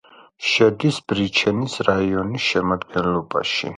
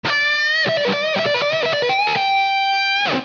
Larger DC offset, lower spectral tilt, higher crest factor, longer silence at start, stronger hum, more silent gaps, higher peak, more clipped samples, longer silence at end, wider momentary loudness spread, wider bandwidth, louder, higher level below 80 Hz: neither; first, -5 dB/octave vs 0 dB/octave; first, 18 dB vs 10 dB; first, 0.4 s vs 0.05 s; neither; neither; first, -2 dBFS vs -8 dBFS; neither; about the same, 0 s vs 0 s; first, 6 LU vs 2 LU; first, 11.5 kHz vs 7.2 kHz; second, -20 LUFS vs -17 LUFS; first, -48 dBFS vs -66 dBFS